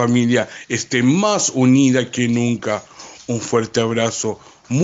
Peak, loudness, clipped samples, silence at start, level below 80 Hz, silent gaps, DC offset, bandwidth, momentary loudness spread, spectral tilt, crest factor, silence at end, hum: -4 dBFS; -18 LUFS; under 0.1%; 0 s; -58 dBFS; none; under 0.1%; 8 kHz; 12 LU; -5 dB/octave; 14 dB; 0 s; none